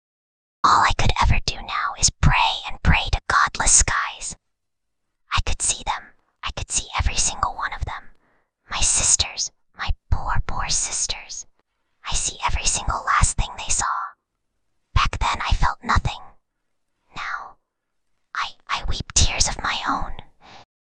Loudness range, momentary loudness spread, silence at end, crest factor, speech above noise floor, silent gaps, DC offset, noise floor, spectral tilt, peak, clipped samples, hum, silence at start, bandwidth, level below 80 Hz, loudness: 7 LU; 15 LU; 0.25 s; 22 dB; 59 dB; none; under 0.1%; -81 dBFS; -1.5 dB/octave; -2 dBFS; under 0.1%; none; 0.65 s; 10 kHz; -28 dBFS; -21 LUFS